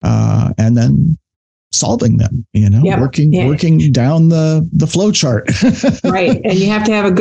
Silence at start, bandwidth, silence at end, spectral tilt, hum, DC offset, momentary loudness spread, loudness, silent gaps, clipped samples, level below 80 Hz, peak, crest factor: 0.05 s; 9 kHz; 0 s; -6 dB/octave; none; under 0.1%; 4 LU; -12 LUFS; 1.36-1.71 s; under 0.1%; -36 dBFS; -2 dBFS; 8 dB